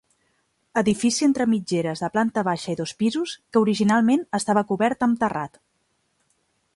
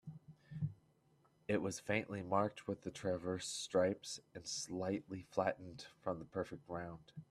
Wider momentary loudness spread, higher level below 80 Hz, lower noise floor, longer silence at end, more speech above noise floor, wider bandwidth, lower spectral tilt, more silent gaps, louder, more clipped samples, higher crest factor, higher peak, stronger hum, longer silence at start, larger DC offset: second, 7 LU vs 13 LU; first, -62 dBFS vs -74 dBFS; second, -70 dBFS vs -74 dBFS; first, 1.3 s vs 0.05 s; first, 49 dB vs 32 dB; second, 11.5 kHz vs 13.5 kHz; about the same, -5 dB/octave vs -4.5 dB/octave; neither; first, -22 LUFS vs -41 LUFS; neither; second, 16 dB vs 22 dB; first, -8 dBFS vs -20 dBFS; neither; first, 0.75 s vs 0.05 s; neither